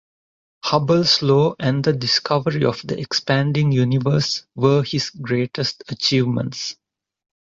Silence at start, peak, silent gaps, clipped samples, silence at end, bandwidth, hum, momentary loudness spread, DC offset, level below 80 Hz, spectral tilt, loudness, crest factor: 0.65 s; -4 dBFS; none; under 0.1%; 0.75 s; 7.6 kHz; none; 9 LU; under 0.1%; -56 dBFS; -5.5 dB/octave; -19 LUFS; 16 dB